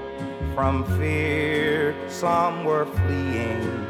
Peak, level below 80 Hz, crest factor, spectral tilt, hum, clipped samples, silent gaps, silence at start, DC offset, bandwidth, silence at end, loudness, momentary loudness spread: -8 dBFS; -42 dBFS; 16 dB; -6.5 dB/octave; none; under 0.1%; none; 0 s; under 0.1%; 14.5 kHz; 0 s; -24 LUFS; 5 LU